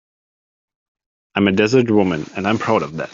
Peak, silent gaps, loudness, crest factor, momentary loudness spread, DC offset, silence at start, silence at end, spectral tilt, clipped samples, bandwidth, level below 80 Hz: -2 dBFS; none; -17 LUFS; 16 dB; 7 LU; under 0.1%; 1.35 s; 0.05 s; -6.5 dB/octave; under 0.1%; 7.6 kHz; -56 dBFS